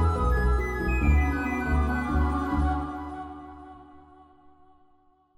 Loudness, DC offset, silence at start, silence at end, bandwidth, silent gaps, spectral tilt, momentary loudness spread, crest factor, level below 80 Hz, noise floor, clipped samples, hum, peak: -27 LUFS; under 0.1%; 0 s; 1.4 s; 10.5 kHz; none; -8 dB/octave; 18 LU; 14 dB; -30 dBFS; -62 dBFS; under 0.1%; none; -12 dBFS